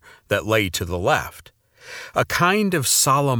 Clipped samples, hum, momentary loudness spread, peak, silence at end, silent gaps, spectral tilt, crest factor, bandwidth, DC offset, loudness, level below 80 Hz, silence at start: under 0.1%; none; 14 LU; -2 dBFS; 0 s; none; -3.5 dB/octave; 20 dB; over 20 kHz; under 0.1%; -20 LUFS; -48 dBFS; 0.3 s